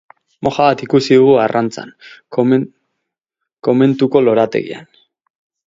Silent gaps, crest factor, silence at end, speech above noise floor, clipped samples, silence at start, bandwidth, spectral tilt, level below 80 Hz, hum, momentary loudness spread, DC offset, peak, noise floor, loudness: none; 16 dB; 0.85 s; 65 dB; under 0.1%; 0.4 s; 7.8 kHz; -7 dB/octave; -56 dBFS; none; 18 LU; under 0.1%; 0 dBFS; -79 dBFS; -14 LUFS